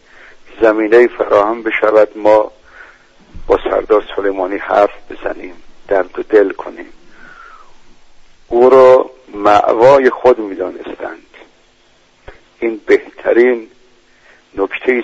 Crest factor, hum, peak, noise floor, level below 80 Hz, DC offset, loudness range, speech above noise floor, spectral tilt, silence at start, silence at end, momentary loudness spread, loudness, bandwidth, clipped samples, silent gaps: 14 dB; none; 0 dBFS; -50 dBFS; -42 dBFS; under 0.1%; 7 LU; 39 dB; -6 dB/octave; 0.55 s; 0 s; 17 LU; -12 LUFS; 7.8 kHz; under 0.1%; none